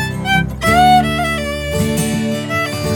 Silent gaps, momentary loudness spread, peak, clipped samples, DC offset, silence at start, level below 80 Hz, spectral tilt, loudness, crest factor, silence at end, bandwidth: none; 8 LU; 0 dBFS; under 0.1%; under 0.1%; 0 s; -30 dBFS; -4.5 dB/octave; -15 LUFS; 14 dB; 0 s; 20 kHz